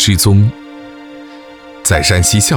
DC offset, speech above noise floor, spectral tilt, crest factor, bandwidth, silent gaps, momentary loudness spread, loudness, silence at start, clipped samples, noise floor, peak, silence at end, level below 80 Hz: under 0.1%; 24 dB; -4 dB/octave; 14 dB; 19 kHz; none; 23 LU; -11 LUFS; 0 s; under 0.1%; -34 dBFS; 0 dBFS; 0 s; -30 dBFS